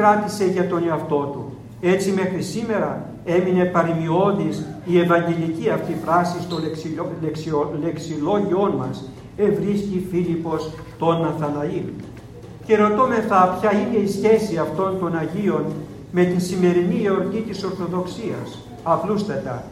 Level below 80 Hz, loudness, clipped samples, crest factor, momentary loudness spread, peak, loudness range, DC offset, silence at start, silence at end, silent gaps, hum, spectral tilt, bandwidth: -52 dBFS; -21 LUFS; under 0.1%; 18 dB; 11 LU; -2 dBFS; 4 LU; under 0.1%; 0 s; 0 s; none; none; -7 dB/octave; 14.5 kHz